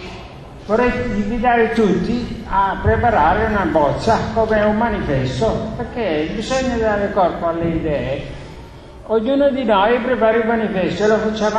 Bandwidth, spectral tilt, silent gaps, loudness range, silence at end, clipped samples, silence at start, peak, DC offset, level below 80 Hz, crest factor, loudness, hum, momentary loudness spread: 10 kHz; -6.5 dB/octave; none; 3 LU; 0 s; under 0.1%; 0 s; -2 dBFS; under 0.1%; -34 dBFS; 16 dB; -17 LUFS; none; 10 LU